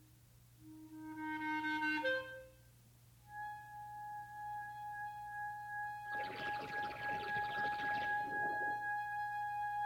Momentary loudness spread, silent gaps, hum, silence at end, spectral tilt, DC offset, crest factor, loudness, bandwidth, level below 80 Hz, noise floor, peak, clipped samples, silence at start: 13 LU; none; none; 0 s; -4.5 dB/octave; under 0.1%; 16 dB; -41 LUFS; 19.5 kHz; -72 dBFS; -64 dBFS; -26 dBFS; under 0.1%; 0 s